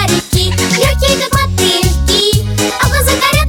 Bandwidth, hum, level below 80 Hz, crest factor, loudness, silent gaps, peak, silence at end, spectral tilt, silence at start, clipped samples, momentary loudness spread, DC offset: 19.5 kHz; none; -18 dBFS; 12 dB; -11 LUFS; none; 0 dBFS; 0 s; -3.5 dB/octave; 0 s; under 0.1%; 3 LU; under 0.1%